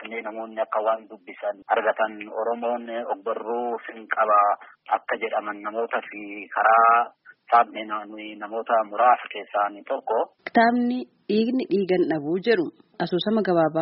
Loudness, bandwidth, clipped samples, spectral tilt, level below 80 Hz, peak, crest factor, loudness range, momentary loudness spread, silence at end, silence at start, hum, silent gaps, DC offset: -24 LUFS; 5.6 kHz; under 0.1%; -3.5 dB/octave; -74 dBFS; -6 dBFS; 18 dB; 5 LU; 13 LU; 0 s; 0 s; none; none; under 0.1%